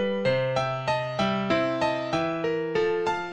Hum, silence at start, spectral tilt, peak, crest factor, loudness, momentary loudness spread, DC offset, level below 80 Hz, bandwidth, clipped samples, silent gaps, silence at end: none; 0 s; -6 dB/octave; -12 dBFS; 14 dB; -26 LUFS; 3 LU; under 0.1%; -56 dBFS; 10 kHz; under 0.1%; none; 0 s